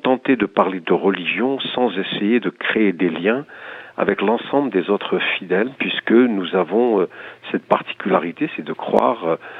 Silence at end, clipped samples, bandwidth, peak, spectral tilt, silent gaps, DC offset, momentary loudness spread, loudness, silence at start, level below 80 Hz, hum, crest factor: 0 s; under 0.1%; 4.9 kHz; 0 dBFS; -8 dB/octave; none; under 0.1%; 8 LU; -19 LUFS; 0.05 s; -64 dBFS; none; 20 dB